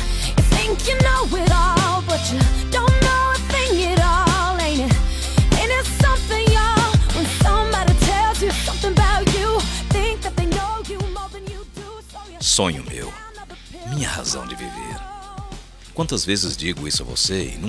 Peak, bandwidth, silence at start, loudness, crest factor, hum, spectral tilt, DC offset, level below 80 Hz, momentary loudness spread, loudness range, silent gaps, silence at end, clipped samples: -4 dBFS; 13 kHz; 0 s; -19 LUFS; 16 dB; none; -4 dB/octave; under 0.1%; -24 dBFS; 17 LU; 7 LU; none; 0 s; under 0.1%